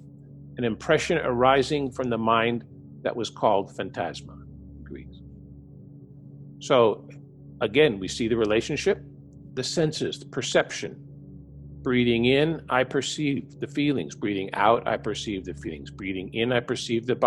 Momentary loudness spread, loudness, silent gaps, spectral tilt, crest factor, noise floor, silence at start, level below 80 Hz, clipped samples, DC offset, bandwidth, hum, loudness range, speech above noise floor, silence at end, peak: 24 LU; -25 LUFS; none; -5 dB/octave; 22 dB; -46 dBFS; 0 s; -52 dBFS; under 0.1%; under 0.1%; 12 kHz; none; 5 LU; 21 dB; 0 s; -4 dBFS